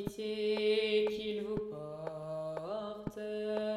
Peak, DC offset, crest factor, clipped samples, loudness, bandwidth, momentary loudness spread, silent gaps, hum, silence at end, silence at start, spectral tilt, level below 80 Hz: -20 dBFS; under 0.1%; 14 dB; under 0.1%; -36 LUFS; 13.5 kHz; 12 LU; none; 50 Hz at -65 dBFS; 0 s; 0 s; -5.5 dB/octave; -64 dBFS